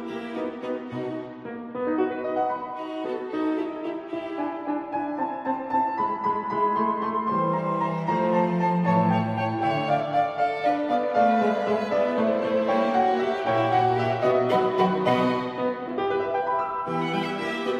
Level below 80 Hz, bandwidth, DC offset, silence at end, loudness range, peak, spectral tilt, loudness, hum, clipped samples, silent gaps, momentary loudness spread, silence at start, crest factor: -66 dBFS; 9.8 kHz; under 0.1%; 0 s; 6 LU; -8 dBFS; -7.5 dB/octave; -25 LUFS; none; under 0.1%; none; 10 LU; 0 s; 16 dB